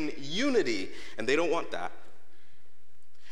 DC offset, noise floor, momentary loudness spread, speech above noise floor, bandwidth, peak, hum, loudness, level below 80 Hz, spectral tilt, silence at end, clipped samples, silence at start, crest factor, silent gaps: 3%; -67 dBFS; 12 LU; 37 dB; 13 kHz; -12 dBFS; none; -31 LUFS; -66 dBFS; -4 dB/octave; 1.35 s; under 0.1%; 0 s; 20 dB; none